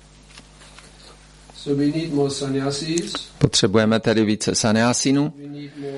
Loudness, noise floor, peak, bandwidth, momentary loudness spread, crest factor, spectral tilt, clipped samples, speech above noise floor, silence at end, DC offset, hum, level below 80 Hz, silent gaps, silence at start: -20 LUFS; -46 dBFS; -2 dBFS; 11.5 kHz; 11 LU; 20 dB; -4.5 dB/octave; under 0.1%; 26 dB; 0 s; under 0.1%; 50 Hz at -50 dBFS; -48 dBFS; none; 0.35 s